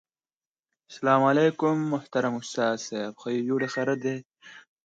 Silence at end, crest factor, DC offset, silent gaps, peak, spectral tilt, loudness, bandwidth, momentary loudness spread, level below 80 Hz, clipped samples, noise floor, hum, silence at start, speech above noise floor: 0.25 s; 20 dB; under 0.1%; 4.26-4.30 s; -6 dBFS; -5.5 dB/octave; -26 LUFS; 9 kHz; 11 LU; -76 dBFS; under 0.1%; under -90 dBFS; none; 0.9 s; over 64 dB